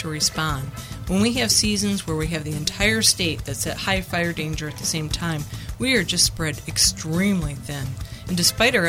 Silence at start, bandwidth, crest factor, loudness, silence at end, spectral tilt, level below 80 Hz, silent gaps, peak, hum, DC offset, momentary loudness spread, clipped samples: 0 s; 16.5 kHz; 18 dB; -21 LUFS; 0 s; -3 dB/octave; -38 dBFS; none; -4 dBFS; none; under 0.1%; 12 LU; under 0.1%